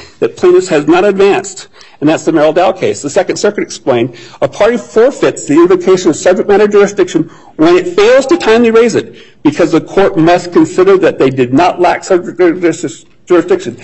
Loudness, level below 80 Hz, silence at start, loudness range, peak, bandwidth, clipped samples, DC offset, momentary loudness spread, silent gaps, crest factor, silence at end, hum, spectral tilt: -9 LUFS; -44 dBFS; 0 s; 3 LU; 0 dBFS; 8.4 kHz; under 0.1%; 0.7%; 8 LU; none; 10 dB; 0.05 s; none; -5 dB/octave